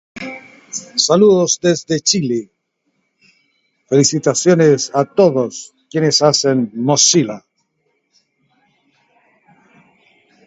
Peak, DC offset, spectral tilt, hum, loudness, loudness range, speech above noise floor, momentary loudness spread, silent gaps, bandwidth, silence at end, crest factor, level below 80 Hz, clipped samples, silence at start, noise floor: 0 dBFS; under 0.1%; -4 dB/octave; none; -14 LUFS; 5 LU; 54 dB; 17 LU; none; 8.2 kHz; 3.1 s; 16 dB; -62 dBFS; under 0.1%; 0.15 s; -68 dBFS